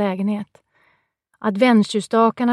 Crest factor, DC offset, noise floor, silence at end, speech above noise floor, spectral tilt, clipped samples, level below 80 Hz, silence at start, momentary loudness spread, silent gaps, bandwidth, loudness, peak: 16 dB; under 0.1%; -65 dBFS; 0 s; 47 dB; -6 dB/octave; under 0.1%; -72 dBFS; 0 s; 12 LU; none; 11.5 kHz; -19 LUFS; -4 dBFS